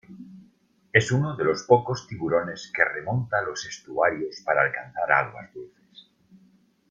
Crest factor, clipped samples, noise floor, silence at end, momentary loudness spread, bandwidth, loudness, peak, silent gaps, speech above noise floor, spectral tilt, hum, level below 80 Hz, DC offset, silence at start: 24 dB; under 0.1%; -61 dBFS; 1.25 s; 19 LU; 9.2 kHz; -24 LUFS; -2 dBFS; none; 37 dB; -5.5 dB/octave; none; -62 dBFS; under 0.1%; 0.1 s